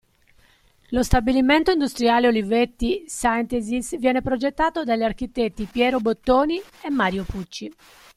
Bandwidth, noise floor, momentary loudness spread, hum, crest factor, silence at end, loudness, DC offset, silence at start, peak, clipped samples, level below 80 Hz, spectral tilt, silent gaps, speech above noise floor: 14.5 kHz; -57 dBFS; 9 LU; none; 20 dB; 0.45 s; -22 LUFS; under 0.1%; 0.9 s; -2 dBFS; under 0.1%; -38 dBFS; -5 dB/octave; none; 36 dB